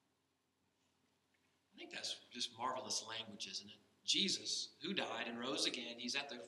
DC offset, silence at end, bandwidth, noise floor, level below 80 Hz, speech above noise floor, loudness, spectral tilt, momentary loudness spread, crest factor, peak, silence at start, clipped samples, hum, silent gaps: under 0.1%; 0 s; 13.5 kHz; -83 dBFS; under -90 dBFS; 40 dB; -41 LUFS; -1.5 dB/octave; 11 LU; 24 dB; -22 dBFS; 1.75 s; under 0.1%; none; none